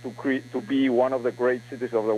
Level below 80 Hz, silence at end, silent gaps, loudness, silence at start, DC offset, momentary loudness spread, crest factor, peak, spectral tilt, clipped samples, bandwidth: -68 dBFS; 0 s; none; -25 LUFS; 0 s; under 0.1%; 7 LU; 16 dB; -10 dBFS; -6.5 dB/octave; under 0.1%; 11.5 kHz